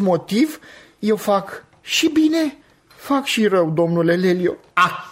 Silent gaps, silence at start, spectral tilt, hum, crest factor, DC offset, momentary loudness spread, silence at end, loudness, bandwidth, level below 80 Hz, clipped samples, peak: none; 0 s; -5 dB/octave; none; 16 dB; under 0.1%; 9 LU; 0 s; -19 LUFS; 16 kHz; -62 dBFS; under 0.1%; -2 dBFS